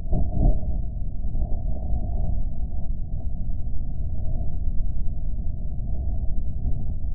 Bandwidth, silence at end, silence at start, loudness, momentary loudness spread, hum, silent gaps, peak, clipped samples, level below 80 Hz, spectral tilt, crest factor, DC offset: 0.9 kHz; 0 s; 0 s; -31 LUFS; 7 LU; none; none; -8 dBFS; under 0.1%; -26 dBFS; -10 dB/octave; 12 dB; under 0.1%